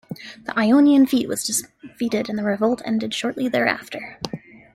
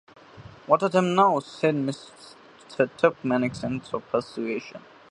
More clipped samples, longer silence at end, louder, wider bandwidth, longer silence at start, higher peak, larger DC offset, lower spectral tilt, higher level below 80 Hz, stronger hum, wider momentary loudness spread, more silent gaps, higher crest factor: neither; about the same, 0.35 s vs 0.35 s; first, -20 LUFS vs -25 LUFS; first, 15.5 kHz vs 11 kHz; second, 0.1 s vs 0.35 s; about the same, -4 dBFS vs -4 dBFS; neither; second, -4 dB/octave vs -6.5 dB/octave; about the same, -60 dBFS vs -62 dBFS; neither; second, 17 LU vs 20 LU; neither; second, 16 dB vs 22 dB